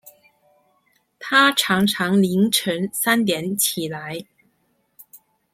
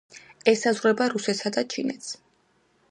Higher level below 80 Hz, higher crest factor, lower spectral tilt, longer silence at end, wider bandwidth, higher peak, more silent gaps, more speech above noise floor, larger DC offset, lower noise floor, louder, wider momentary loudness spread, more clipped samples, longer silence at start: first, -62 dBFS vs -76 dBFS; about the same, 20 dB vs 22 dB; about the same, -3.5 dB/octave vs -3.5 dB/octave; second, 0.4 s vs 0.75 s; first, 16.5 kHz vs 11 kHz; about the same, -2 dBFS vs -4 dBFS; neither; first, 47 dB vs 41 dB; neither; about the same, -67 dBFS vs -66 dBFS; first, -19 LUFS vs -25 LUFS; about the same, 15 LU vs 14 LU; neither; first, 1.2 s vs 0.15 s